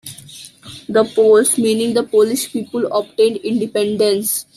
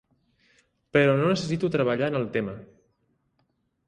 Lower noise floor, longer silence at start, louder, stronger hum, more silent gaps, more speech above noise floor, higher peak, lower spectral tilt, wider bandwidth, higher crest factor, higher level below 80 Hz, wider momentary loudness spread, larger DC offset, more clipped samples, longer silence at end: second, -38 dBFS vs -72 dBFS; second, 0.05 s vs 0.95 s; first, -16 LUFS vs -25 LUFS; neither; neither; second, 23 dB vs 48 dB; first, -2 dBFS vs -8 dBFS; second, -3.5 dB/octave vs -6.5 dB/octave; first, 14 kHz vs 10.5 kHz; second, 14 dB vs 20 dB; about the same, -60 dBFS vs -62 dBFS; first, 22 LU vs 10 LU; neither; neither; second, 0.15 s vs 1.25 s